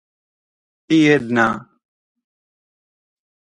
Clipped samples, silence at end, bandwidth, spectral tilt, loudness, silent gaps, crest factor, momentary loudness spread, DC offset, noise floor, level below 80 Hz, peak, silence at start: under 0.1%; 1.8 s; 9.4 kHz; -6 dB/octave; -16 LUFS; none; 20 dB; 7 LU; under 0.1%; under -90 dBFS; -58 dBFS; -2 dBFS; 0.9 s